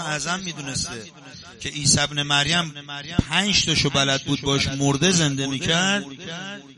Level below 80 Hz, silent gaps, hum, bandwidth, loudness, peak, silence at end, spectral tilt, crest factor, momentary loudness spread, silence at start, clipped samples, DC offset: -44 dBFS; none; none; 11.5 kHz; -21 LUFS; -2 dBFS; 0.05 s; -3 dB/octave; 20 dB; 15 LU; 0 s; under 0.1%; under 0.1%